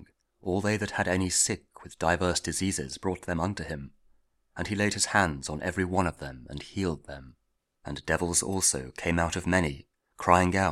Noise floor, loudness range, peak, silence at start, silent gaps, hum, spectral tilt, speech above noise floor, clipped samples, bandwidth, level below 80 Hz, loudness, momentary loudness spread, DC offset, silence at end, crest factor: -65 dBFS; 3 LU; -4 dBFS; 0 s; none; none; -3.5 dB/octave; 37 dB; under 0.1%; 15.5 kHz; -48 dBFS; -28 LUFS; 16 LU; under 0.1%; 0 s; 24 dB